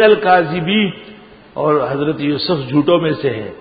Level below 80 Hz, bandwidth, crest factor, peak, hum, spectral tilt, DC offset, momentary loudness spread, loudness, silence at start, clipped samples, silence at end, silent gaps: -52 dBFS; 5 kHz; 14 dB; 0 dBFS; none; -11.5 dB/octave; under 0.1%; 8 LU; -15 LUFS; 0 s; under 0.1%; 0 s; none